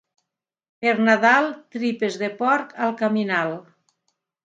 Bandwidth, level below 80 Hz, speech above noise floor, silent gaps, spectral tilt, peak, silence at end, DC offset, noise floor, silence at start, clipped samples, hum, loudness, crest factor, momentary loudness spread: 7.8 kHz; -76 dBFS; 60 dB; none; -5.5 dB/octave; -2 dBFS; 0.85 s; under 0.1%; -81 dBFS; 0.8 s; under 0.1%; none; -21 LUFS; 20 dB; 11 LU